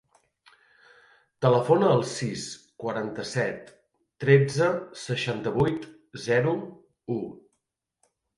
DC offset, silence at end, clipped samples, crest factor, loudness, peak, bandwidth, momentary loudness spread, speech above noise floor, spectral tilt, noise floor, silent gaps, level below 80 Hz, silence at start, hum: under 0.1%; 1 s; under 0.1%; 22 dB; -26 LUFS; -6 dBFS; 11.5 kHz; 17 LU; 55 dB; -6 dB/octave; -80 dBFS; none; -60 dBFS; 1.4 s; none